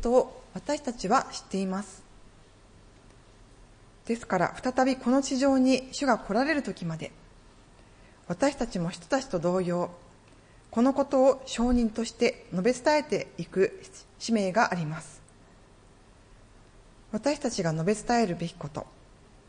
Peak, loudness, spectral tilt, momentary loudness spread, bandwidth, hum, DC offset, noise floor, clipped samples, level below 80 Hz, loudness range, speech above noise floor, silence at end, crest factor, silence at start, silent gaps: -10 dBFS; -28 LUFS; -5 dB/octave; 14 LU; 10.5 kHz; none; under 0.1%; -55 dBFS; under 0.1%; -50 dBFS; 7 LU; 28 dB; 0.65 s; 20 dB; 0 s; none